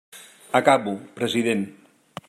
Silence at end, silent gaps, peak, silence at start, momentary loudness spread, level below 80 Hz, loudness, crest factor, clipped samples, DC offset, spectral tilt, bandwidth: 0.55 s; none; -2 dBFS; 0.15 s; 15 LU; -72 dBFS; -22 LUFS; 22 dB; under 0.1%; under 0.1%; -4.5 dB/octave; 15.5 kHz